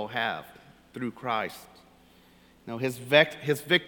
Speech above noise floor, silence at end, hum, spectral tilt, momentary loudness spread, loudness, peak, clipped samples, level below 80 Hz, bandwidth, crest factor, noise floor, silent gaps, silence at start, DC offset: 30 dB; 0 s; none; -4.5 dB/octave; 22 LU; -27 LUFS; -4 dBFS; under 0.1%; -68 dBFS; 19 kHz; 26 dB; -58 dBFS; none; 0 s; under 0.1%